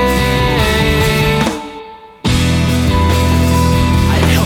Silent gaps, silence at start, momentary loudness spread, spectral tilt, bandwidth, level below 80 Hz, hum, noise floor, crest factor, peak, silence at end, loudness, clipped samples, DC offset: none; 0 s; 6 LU; -5.5 dB/octave; 17.5 kHz; -20 dBFS; none; -32 dBFS; 12 dB; 0 dBFS; 0 s; -13 LUFS; under 0.1%; under 0.1%